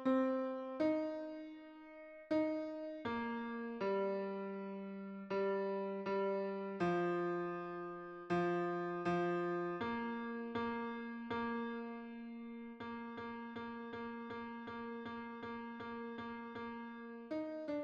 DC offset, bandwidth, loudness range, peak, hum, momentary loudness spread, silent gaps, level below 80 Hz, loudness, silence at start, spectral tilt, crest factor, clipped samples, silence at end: under 0.1%; 7.8 kHz; 8 LU; -24 dBFS; none; 12 LU; none; -76 dBFS; -42 LUFS; 0 s; -8 dB/octave; 16 dB; under 0.1%; 0 s